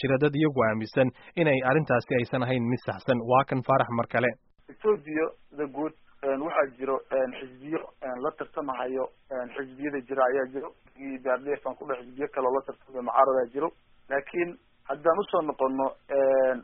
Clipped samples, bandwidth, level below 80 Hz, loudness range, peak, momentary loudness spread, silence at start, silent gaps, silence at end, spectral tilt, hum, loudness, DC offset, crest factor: under 0.1%; 5.4 kHz; -62 dBFS; 6 LU; -8 dBFS; 12 LU; 0 s; none; 0 s; -5.5 dB/octave; none; -28 LUFS; under 0.1%; 20 dB